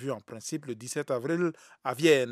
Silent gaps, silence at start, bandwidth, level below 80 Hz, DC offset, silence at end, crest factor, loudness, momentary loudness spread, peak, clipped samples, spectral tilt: none; 0 s; 15.5 kHz; -84 dBFS; under 0.1%; 0 s; 20 dB; -30 LUFS; 13 LU; -10 dBFS; under 0.1%; -4.5 dB/octave